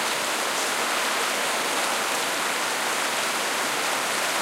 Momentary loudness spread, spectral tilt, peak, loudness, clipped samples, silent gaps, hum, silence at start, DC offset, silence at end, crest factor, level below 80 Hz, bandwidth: 1 LU; 0 dB/octave; -12 dBFS; -24 LUFS; under 0.1%; none; none; 0 s; under 0.1%; 0 s; 14 dB; -74 dBFS; 16 kHz